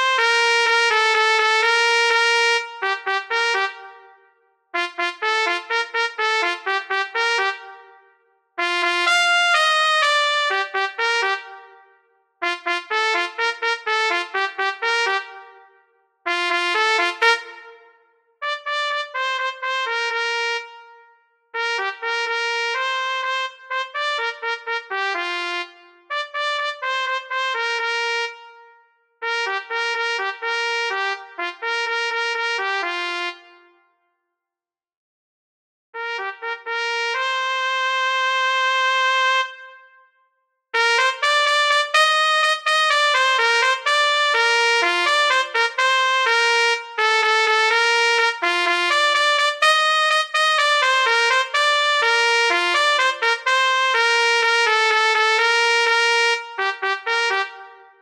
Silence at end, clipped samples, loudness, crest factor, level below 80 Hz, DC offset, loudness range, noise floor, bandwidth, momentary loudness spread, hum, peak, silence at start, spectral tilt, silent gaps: 0.25 s; under 0.1%; -18 LUFS; 20 dB; -74 dBFS; under 0.1%; 8 LU; under -90 dBFS; 14 kHz; 10 LU; none; 0 dBFS; 0 s; 2 dB/octave; 34.97-35.93 s